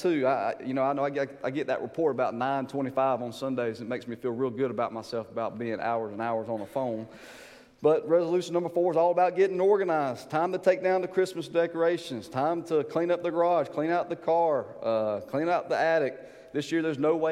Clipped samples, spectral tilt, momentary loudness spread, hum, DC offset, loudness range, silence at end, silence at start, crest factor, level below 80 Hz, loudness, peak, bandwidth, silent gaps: under 0.1%; -6.5 dB/octave; 9 LU; none; under 0.1%; 6 LU; 0 s; 0 s; 18 dB; -72 dBFS; -28 LUFS; -10 dBFS; 13.5 kHz; none